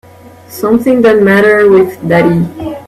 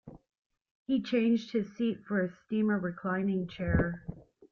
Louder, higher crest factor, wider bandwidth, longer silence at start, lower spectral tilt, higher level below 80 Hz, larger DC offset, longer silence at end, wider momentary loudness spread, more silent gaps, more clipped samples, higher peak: first, -8 LUFS vs -31 LUFS; second, 10 dB vs 16 dB; first, 13.5 kHz vs 6.8 kHz; first, 0.5 s vs 0.05 s; about the same, -7 dB/octave vs -8 dB/octave; first, -44 dBFS vs -50 dBFS; neither; second, 0.05 s vs 0.3 s; first, 11 LU vs 7 LU; second, none vs 0.38-0.50 s, 0.71-0.86 s; neither; first, 0 dBFS vs -16 dBFS